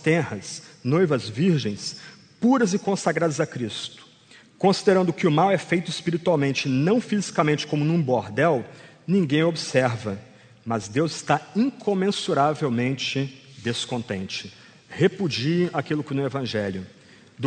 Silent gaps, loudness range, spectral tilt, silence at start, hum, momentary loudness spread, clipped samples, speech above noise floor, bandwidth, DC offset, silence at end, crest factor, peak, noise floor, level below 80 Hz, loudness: none; 4 LU; -5.5 dB/octave; 0 s; none; 12 LU; under 0.1%; 29 dB; 9.4 kHz; under 0.1%; 0 s; 20 dB; -4 dBFS; -52 dBFS; -64 dBFS; -24 LUFS